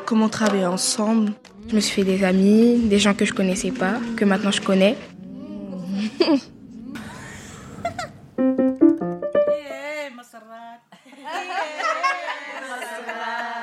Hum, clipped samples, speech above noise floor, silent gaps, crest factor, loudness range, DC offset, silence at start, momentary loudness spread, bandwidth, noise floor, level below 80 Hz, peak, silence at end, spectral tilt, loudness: none; under 0.1%; 27 dB; none; 18 dB; 9 LU; under 0.1%; 0 s; 20 LU; 13.5 kHz; -46 dBFS; -54 dBFS; -4 dBFS; 0 s; -5 dB/octave; -21 LUFS